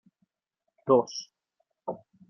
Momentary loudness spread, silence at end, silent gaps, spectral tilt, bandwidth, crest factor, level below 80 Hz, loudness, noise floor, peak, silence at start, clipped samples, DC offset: 17 LU; 0.35 s; none; -6 dB/octave; 6.6 kHz; 22 dB; -80 dBFS; -26 LUFS; -84 dBFS; -8 dBFS; 0.85 s; under 0.1%; under 0.1%